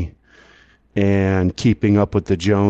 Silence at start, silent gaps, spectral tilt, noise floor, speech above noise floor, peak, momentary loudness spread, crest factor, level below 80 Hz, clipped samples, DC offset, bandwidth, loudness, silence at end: 0 s; none; -7.5 dB/octave; -52 dBFS; 35 dB; -4 dBFS; 7 LU; 14 dB; -34 dBFS; under 0.1%; under 0.1%; 8.2 kHz; -18 LUFS; 0 s